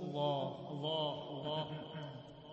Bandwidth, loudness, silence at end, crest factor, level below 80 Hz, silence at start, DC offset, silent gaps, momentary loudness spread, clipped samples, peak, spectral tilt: 8 kHz; -40 LUFS; 0 s; 16 dB; -76 dBFS; 0 s; under 0.1%; none; 11 LU; under 0.1%; -24 dBFS; -4.5 dB/octave